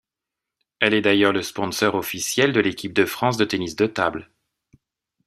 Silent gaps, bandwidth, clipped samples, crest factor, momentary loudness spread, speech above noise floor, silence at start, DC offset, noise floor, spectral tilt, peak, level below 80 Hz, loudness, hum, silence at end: none; 15.5 kHz; under 0.1%; 20 dB; 7 LU; 65 dB; 0.8 s; under 0.1%; -86 dBFS; -4 dB/octave; -2 dBFS; -60 dBFS; -21 LUFS; none; 1.05 s